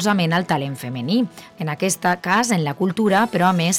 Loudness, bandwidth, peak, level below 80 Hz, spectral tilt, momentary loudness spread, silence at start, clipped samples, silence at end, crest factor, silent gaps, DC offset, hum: -20 LUFS; 17.5 kHz; -4 dBFS; -60 dBFS; -4.5 dB/octave; 10 LU; 0 s; under 0.1%; 0 s; 16 dB; none; under 0.1%; none